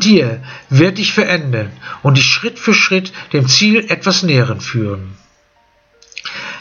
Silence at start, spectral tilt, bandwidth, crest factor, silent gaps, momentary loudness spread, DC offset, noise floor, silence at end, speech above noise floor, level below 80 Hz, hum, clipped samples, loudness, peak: 0 s; -4.5 dB/octave; 7.4 kHz; 14 dB; none; 16 LU; under 0.1%; -54 dBFS; 0 s; 41 dB; -54 dBFS; none; under 0.1%; -13 LUFS; 0 dBFS